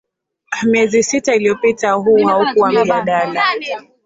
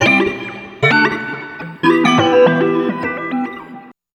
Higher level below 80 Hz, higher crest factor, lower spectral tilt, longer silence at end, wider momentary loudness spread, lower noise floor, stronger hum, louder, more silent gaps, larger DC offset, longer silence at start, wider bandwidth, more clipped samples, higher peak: about the same, -56 dBFS vs -54 dBFS; about the same, 12 dB vs 16 dB; second, -4 dB/octave vs -5.5 dB/octave; about the same, 0.25 s vs 0.3 s; second, 6 LU vs 16 LU; about the same, -34 dBFS vs -37 dBFS; neither; about the same, -14 LUFS vs -14 LUFS; neither; neither; first, 0.5 s vs 0 s; second, 8 kHz vs 10.5 kHz; neither; about the same, -2 dBFS vs 0 dBFS